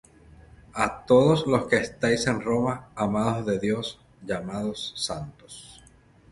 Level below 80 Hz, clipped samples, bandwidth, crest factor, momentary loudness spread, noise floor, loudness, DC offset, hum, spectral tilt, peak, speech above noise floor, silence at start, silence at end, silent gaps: -54 dBFS; under 0.1%; 11.5 kHz; 20 dB; 18 LU; -55 dBFS; -25 LUFS; under 0.1%; none; -5.5 dB/octave; -6 dBFS; 30 dB; 0.75 s; 0.55 s; none